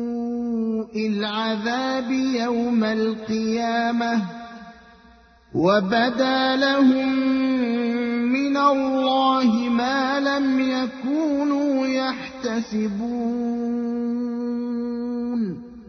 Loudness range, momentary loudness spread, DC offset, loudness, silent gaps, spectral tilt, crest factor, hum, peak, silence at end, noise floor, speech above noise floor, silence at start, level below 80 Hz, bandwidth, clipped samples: 5 LU; 8 LU; under 0.1%; -22 LUFS; none; -5.5 dB/octave; 16 dB; none; -6 dBFS; 0 s; -52 dBFS; 31 dB; 0 s; -58 dBFS; 6.6 kHz; under 0.1%